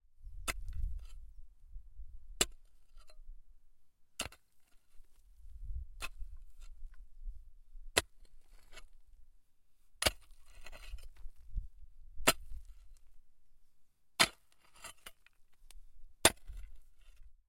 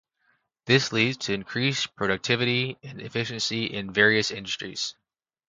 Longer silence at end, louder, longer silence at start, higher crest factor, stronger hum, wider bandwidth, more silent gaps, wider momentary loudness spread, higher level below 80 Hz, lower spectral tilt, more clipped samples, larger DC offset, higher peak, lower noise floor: second, 0 s vs 0.55 s; second, -35 LUFS vs -25 LUFS; second, 0.05 s vs 0.65 s; first, 34 dB vs 24 dB; neither; first, 16.5 kHz vs 9.4 kHz; neither; first, 28 LU vs 11 LU; first, -50 dBFS vs -62 dBFS; second, -1.5 dB/octave vs -4 dB/octave; neither; neither; about the same, -6 dBFS vs -4 dBFS; second, -64 dBFS vs -70 dBFS